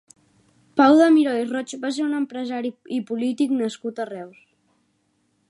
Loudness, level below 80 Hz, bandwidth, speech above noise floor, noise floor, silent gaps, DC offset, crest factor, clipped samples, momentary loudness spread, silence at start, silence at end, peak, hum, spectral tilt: -21 LUFS; -78 dBFS; 11.5 kHz; 47 dB; -68 dBFS; none; under 0.1%; 18 dB; under 0.1%; 16 LU; 0.75 s; 1.2 s; -4 dBFS; none; -4.5 dB/octave